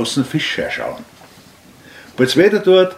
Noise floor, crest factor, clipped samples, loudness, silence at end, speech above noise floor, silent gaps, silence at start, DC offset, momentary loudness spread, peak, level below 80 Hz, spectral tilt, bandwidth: -44 dBFS; 16 dB; under 0.1%; -16 LUFS; 0 s; 29 dB; none; 0 s; under 0.1%; 17 LU; 0 dBFS; -54 dBFS; -5 dB/octave; 15.5 kHz